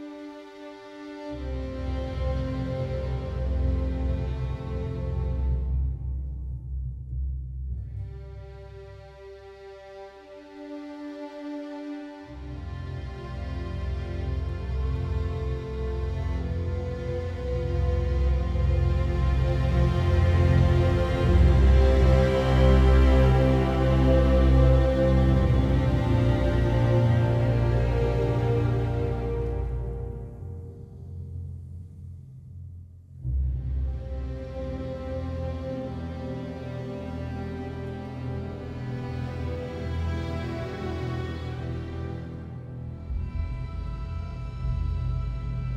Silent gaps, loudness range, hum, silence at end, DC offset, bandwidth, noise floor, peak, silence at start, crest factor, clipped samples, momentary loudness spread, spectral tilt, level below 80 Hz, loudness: none; 17 LU; none; 0 s; under 0.1%; 7 kHz; -46 dBFS; -8 dBFS; 0 s; 18 dB; under 0.1%; 20 LU; -8.5 dB/octave; -28 dBFS; -27 LUFS